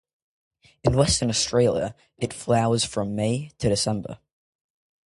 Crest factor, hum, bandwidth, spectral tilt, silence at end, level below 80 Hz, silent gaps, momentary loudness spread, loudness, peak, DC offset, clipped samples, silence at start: 20 dB; none; 11.5 kHz; -4.5 dB/octave; 0.9 s; -44 dBFS; none; 12 LU; -24 LUFS; -4 dBFS; under 0.1%; under 0.1%; 0.85 s